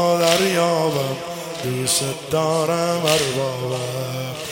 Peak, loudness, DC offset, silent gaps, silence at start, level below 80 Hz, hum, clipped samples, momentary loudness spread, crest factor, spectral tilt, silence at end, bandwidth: 0 dBFS; -20 LUFS; under 0.1%; none; 0 s; -58 dBFS; none; under 0.1%; 10 LU; 20 dB; -3.5 dB/octave; 0 s; 17 kHz